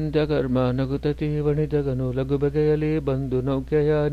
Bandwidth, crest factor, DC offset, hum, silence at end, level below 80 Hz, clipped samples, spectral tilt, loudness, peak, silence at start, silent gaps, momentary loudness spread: 6.8 kHz; 14 dB; under 0.1%; none; 0 s; -38 dBFS; under 0.1%; -9.5 dB/octave; -23 LUFS; -10 dBFS; 0 s; none; 4 LU